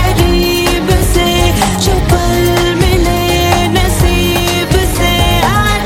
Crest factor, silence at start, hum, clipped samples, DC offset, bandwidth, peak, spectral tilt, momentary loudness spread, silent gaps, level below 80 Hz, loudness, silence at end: 10 dB; 0 s; none; under 0.1%; under 0.1%; 17 kHz; 0 dBFS; -4.5 dB/octave; 1 LU; none; -16 dBFS; -11 LUFS; 0 s